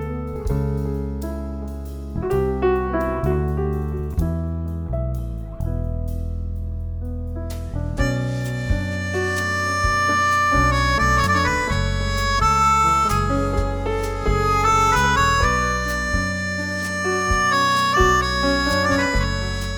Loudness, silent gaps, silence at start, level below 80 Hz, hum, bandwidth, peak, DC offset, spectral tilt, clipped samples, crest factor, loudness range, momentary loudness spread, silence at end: -21 LUFS; none; 0 s; -28 dBFS; none; over 20 kHz; -2 dBFS; under 0.1%; -5 dB/octave; under 0.1%; 18 dB; 9 LU; 13 LU; 0 s